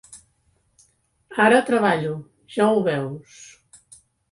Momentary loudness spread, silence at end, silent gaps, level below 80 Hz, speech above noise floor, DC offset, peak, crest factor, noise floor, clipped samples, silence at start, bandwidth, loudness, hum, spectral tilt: 16 LU; 0.9 s; none; -64 dBFS; 46 dB; under 0.1%; -2 dBFS; 22 dB; -66 dBFS; under 0.1%; 0.1 s; 11.5 kHz; -20 LUFS; none; -5.5 dB/octave